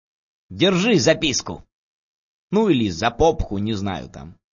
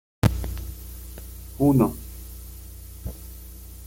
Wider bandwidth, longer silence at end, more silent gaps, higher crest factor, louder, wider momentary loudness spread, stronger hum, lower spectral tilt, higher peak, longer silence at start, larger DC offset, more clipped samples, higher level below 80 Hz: second, 7.4 kHz vs 17 kHz; first, 0.2 s vs 0 s; first, 1.72-2.50 s vs none; second, 18 dB vs 24 dB; first, -20 LUFS vs -24 LUFS; second, 17 LU vs 21 LU; second, none vs 60 Hz at -40 dBFS; second, -4.5 dB/octave vs -7.5 dB/octave; about the same, -4 dBFS vs -4 dBFS; first, 0.5 s vs 0.25 s; neither; neither; about the same, -38 dBFS vs -36 dBFS